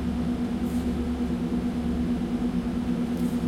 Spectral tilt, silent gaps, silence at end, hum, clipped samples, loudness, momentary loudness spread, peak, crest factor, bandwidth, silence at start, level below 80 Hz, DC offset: -7.5 dB/octave; none; 0 s; none; under 0.1%; -28 LUFS; 1 LU; -16 dBFS; 10 dB; 14.5 kHz; 0 s; -38 dBFS; under 0.1%